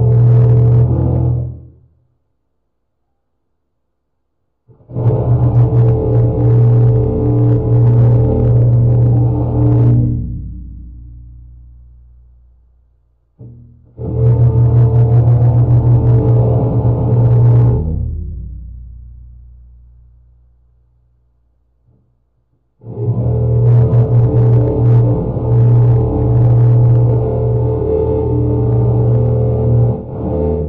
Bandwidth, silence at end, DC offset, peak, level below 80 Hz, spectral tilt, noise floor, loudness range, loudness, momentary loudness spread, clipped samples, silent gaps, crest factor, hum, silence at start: 1.7 kHz; 0 s; 0.1%; -2 dBFS; -26 dBFS; -13 dB/octave; -70 dBFS; 11 LU; -12 LUFS; 11 LU; under 0.1%; none; 10 dB; none; 0 s